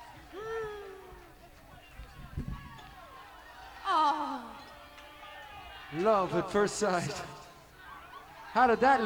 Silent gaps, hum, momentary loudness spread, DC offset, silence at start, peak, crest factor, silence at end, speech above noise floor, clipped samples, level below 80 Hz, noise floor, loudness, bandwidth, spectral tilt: none; none; 22 LU; under 0.1%; 0 s; -14 dBFS; 20 dB; 0 s; 26 dB; under 0.1%; -54 dBFS; -54 dBFS; -31 LUFS; 19.5 kHz; -4.5 dB/octave